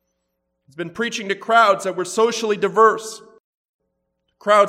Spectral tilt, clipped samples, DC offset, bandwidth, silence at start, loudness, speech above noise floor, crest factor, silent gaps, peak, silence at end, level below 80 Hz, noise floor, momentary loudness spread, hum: -3 dB/octave; under 0.1%; under 0.1%; 15 kHz; 0.8 s; -18 LUFS; 56 dB; 18 dB; 3.40-3.79 s; -2 dBFS; 0 s; -72 dBFS; -74 dBFS; 17 LU; none